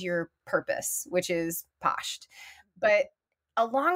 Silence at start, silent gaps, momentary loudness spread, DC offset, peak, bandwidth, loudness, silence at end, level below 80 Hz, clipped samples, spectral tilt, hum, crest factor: 0 s; none; 14 LU; under 0.1%; -12 dBFS; 16 kHz; -29 LUFS; 0 s; -70 dBFS; under 0.1%; -3 dB/octave; none; 18 dB